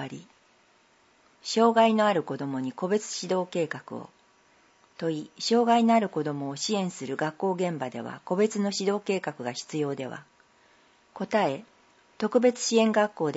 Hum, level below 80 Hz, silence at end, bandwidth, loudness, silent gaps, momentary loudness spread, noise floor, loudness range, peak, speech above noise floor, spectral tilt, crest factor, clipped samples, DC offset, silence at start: none; -78 dBFS; 0 s; 8 kHz; -27 LUFS; none; 15 LU; -62 dBFS; 5 LU; -8 dBFS; 36 dB; -4.5 dB/octave; 20 dB; under 0.1%; under 0.1%; 0 s